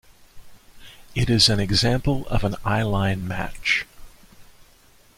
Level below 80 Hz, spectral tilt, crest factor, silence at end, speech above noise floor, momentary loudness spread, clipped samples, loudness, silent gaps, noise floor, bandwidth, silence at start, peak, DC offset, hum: -36 dBFS; -4.5 dB/octave; 20 dB; 0.75 s; 33 dB; 11 LU; under 0.1%; -22 LUFS; none; -54 dBFS; 16 kHz; 0.35 s; -4 dBFS; under 0.1%; none